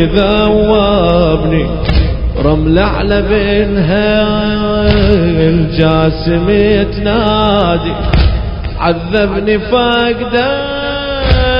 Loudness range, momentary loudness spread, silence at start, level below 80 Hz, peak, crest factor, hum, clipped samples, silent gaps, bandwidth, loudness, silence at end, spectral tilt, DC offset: 2 LU; 5 LU; 0 s; -18 dBFS; 0 dBFS; 10 dB; none; 0.1%; none; 5.4 kHz; -11 LUFS; 0 s; -9 dB/octave; under 0.1%